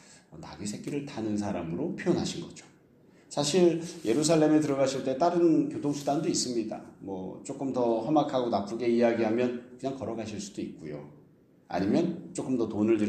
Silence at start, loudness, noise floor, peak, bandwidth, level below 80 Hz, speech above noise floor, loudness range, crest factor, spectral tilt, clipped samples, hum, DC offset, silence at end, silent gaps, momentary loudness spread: 0.1 s; -29 LUFS; -59 dBFS; -12 dBFS; 12.5 kHz; -66 dBFS; 31 dB; 7 LU; 18 dB; -5.5 dB/octave; under 0.1%; none; under 0.1%; 0 s; none; 14 LU